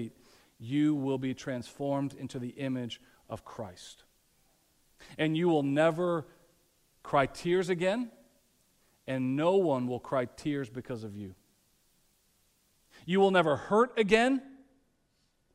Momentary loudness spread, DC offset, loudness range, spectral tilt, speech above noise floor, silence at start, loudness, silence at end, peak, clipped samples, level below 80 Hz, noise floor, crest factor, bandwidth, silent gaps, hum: 20 LU; under 0.1%; 9 LU; -6.5 dB/octave; 43 dB; 0 s; -30 LUFS; 1 s; -10 dBFS; under 0.1%; -66 dBFS; -73 dBFS; 22 dB; 15 kHz; none; none